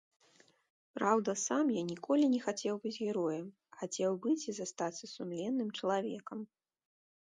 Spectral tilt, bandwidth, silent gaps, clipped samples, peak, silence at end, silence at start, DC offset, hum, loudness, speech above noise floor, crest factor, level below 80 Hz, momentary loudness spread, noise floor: -4.5 dB/octave; 10 kHz; none; under 0.1%; -16 dBFS; 0.9 s; 0.95 s; under 0.1%; none; -35 LUFS; 33 dB; 20 dB; -86 dBFS; 13 LU; -68 dBFS